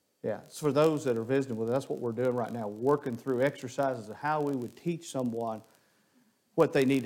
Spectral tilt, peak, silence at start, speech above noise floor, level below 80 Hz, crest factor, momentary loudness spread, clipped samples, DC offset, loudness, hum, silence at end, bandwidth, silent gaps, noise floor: -6.5 dB/octave; -10 dBFS; 0.25 s; 39 dB; -74 dBFS; 20 dB; 10 LU; under 0.1%; under 0.1%; -31 LUFS; none; 0 s; 17 kHz; none; -68 dBFS